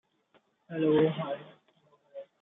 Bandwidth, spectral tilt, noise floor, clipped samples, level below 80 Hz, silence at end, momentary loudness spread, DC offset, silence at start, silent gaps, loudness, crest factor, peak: 3.9 kHz; -6.5 dB/octave; -69 dBFS; under 0.1%; -76 dBFS; 0.2 s; 23 LU; under 0.1%; 0.7 s; none; -29 LUFS; 18 dB; -14 dBFS